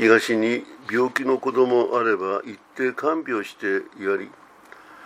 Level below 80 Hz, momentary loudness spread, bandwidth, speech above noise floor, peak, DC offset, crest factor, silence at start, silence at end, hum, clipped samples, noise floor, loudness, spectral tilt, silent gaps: -76 dBFS; 9 LU; 15 kHz; 25 dB; -2 dBFS; under 0.1%; 20 dB; 0 s; 0 s; none; under 0.1%; -47 dBFS; -23 LUFS; -5 dB/octave; none